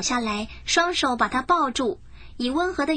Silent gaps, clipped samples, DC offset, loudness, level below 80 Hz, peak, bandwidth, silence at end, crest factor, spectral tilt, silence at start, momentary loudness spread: none; under 0.1%; under 0.1%; -23 LUFS; -46 dBFS; -8 dBFS; 10 kHz; 0 s; 16 dB; -2.5 dB/octave; 0 s; 8 LU